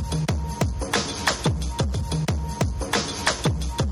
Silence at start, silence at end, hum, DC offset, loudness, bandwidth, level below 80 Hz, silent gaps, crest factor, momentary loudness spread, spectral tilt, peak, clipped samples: 0 s; 0 s; none; under 0.1%; -25 LUFS; 16 kHz; -32 dBFS; none; 16 dB; 4 LU; -4.5 dB/octave; -8 dBFS; under 0.1%